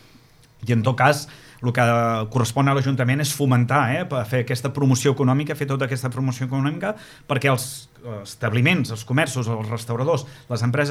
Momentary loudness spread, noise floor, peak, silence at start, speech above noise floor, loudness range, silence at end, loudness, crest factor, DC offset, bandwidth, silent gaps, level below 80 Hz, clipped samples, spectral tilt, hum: 10 LU; -51 dBFS; -2 dBFS; 0.6 s; 30 dB; 3 LU; 0 s; -21 LUFS; 20 dB; under 0.1%; 15.5 kHz; none; -58 dBFS; under 0.1%; -5.5 dB/octave; none